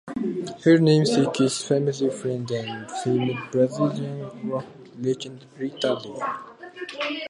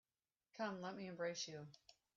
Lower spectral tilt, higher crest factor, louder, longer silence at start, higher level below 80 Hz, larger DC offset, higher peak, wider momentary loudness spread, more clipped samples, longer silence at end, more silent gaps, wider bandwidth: first, -6 dB/octave vs -3.5 dB/octave; about the same, 18 dB vs 18 dB; first, -24 LUFS vs -48 LUFS; second, 0.05 s vs 0.55 s; first, -68 dBFS vs -88 dBFS; neither; first, -6 dBFS vs -32 dBFS; about the same, 15 LU vs 17 LU; neither; second, 0 s vs 0.25 s; neither; first, 11.5 kHz vs 7.4 kHz